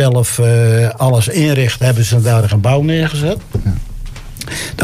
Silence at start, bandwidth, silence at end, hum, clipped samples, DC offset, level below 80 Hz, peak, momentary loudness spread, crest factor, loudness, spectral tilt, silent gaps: 0 s; 15.5 kHz; 0 s; none; under 0.1%; under 0.1%; -30 dBFS; -2 dBFS; 12 LU; 10 dB; -13 LUFS; -5.5 dB/octave; none